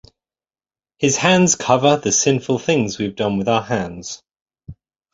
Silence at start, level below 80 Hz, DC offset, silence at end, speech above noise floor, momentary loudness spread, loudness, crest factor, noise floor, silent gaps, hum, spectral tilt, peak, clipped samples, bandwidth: 1 s; -52 dBFS; under 0.1%; 0.4 s; over 73 dB; 12 LU; -17 LUFS; 18 dB; under -90 dBFS; 4.41-4.46 s; none; -4 dB/octave; 0 dBFS; under 0.1%; 8 kHz